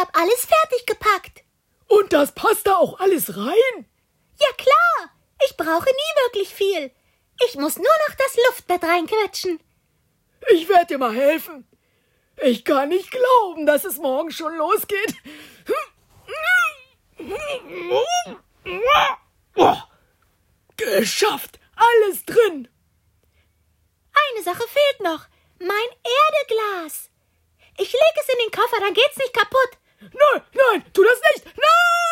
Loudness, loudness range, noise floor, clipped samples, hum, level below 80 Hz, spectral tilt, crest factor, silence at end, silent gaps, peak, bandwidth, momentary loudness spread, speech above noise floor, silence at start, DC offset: -19 LUFS; 5 LU; -66 dBFS; under 0.1%; none; -60 dBFS; -2.5 dB/octave; 16 dB; 0 s; none; -4 dBFS; 16.5 kHz; 13 LU; 47 dB; 0 s; under 0.1%